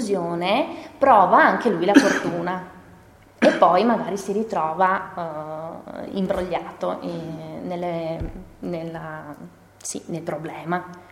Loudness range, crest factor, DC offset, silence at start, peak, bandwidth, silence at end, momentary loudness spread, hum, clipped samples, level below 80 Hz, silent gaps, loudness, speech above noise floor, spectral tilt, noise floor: 12 LU; 22 dB; under 0.1%; 0 s; 0 dBFS; 15.5 kHz; 0.1 s; 18 LU; none; under 0.1%; -50 dBFS; none; -22 LUFS; 27 dB; -5 dB/octave; -49 dBFS